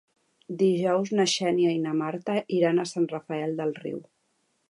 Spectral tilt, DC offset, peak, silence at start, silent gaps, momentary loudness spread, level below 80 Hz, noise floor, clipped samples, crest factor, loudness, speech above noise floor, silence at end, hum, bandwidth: -5 dB/octave; under 0.1%; -10 dBFS; 0.5 s; none; 9 LU; -78 dBFS; -72 dBFS; under 0.1%; 16 dB; -26 LUFS; 47 dB; 0.7 s; none; 11 kHz